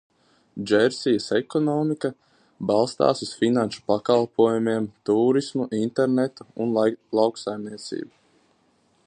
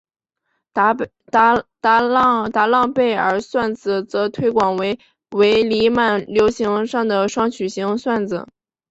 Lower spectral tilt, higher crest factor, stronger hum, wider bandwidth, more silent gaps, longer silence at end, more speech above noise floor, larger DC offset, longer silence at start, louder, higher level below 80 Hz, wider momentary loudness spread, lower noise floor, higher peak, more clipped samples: about the same, -6 dB/octave vs -5 dB/octave; about the same, 20 dB vs 16 dB; neither; first, 10 kHz vs 8 kHz; neither; first, 1 s vs 0.45 s; second, 41 dB vs 55 dB; neither; second, 0.55 s vs 0.75 s; second, -23 LUFS vs -18 LUFS; second, -66 dBFS vs -54 dBFS; first, 12 LU vs 8 LU; second, -64 dBFS vs -73 dBFS; about the same, -4 dBFS vs -2 dBFS; neither